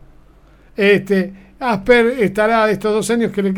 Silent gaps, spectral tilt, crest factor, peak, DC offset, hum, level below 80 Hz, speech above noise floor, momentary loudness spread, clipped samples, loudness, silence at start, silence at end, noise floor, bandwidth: none; -5.5 dB/octave; 16 dB; 0 dBFS; under 0.1%; none; -44 dBFS; 31 dB; 9 LU; under 0.1%; -15 LUFS; 0.8 s; 0 s; -46 dBFS; 17 kHz